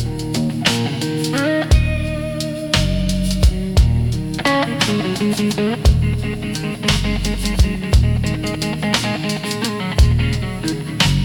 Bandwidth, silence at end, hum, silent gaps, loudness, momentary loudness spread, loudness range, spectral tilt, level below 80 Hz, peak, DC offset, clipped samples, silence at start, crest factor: 18 kHz; 0 s; none; none; -18 LUFS; 6 LU; 1 LU; -5 dB/octave; -22 dBFS; -2 dBFS; under 0.1%; under 0.1%; 0 s; 16 dB